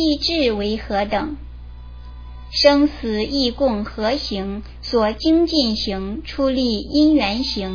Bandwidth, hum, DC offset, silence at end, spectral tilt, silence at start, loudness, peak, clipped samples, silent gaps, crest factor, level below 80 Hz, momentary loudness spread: 5.4 kHz; 60 Hz at -35 dBFS; under 0.1%; 0 s; -5.5 dB/octave; 0 s; -19 LUFS; 0 dBFS; under 0.1%; none; 18 dB; -36 dBFS; 22 LU